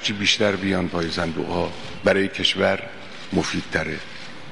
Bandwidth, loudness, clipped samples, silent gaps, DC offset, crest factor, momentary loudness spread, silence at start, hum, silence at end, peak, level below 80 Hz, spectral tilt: 11.5 kHz; -22 LUFS; under 0.1%; none; 1%; 20 dB; 13 LU; 0 s; none; 0 s; -4 dBFS; -50 dBFS; -4 dB/octave